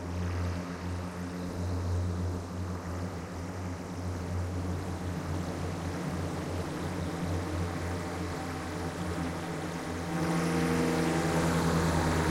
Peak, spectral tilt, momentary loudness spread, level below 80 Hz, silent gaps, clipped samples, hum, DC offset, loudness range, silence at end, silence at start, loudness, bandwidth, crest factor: -16 dBFS; -6 dB/octave; 9 LU; -46 dBFS; none; under 0.1%; none; under 0.1%; 6 LU; 0 s; 0 s; -33 LUFS; 16 kHz; 16 dB